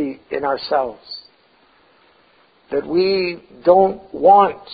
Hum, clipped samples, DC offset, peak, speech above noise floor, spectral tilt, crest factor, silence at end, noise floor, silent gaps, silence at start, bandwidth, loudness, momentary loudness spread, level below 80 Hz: none; under 0.1%; under 0.1%; -2 dBFS; 38 dB; -10.5 dB/octave; 18 dB; 0 s; -55 dBFS; none; 0 s; 5 kHz; -17 LUFS; 15 LU; -56 dBFS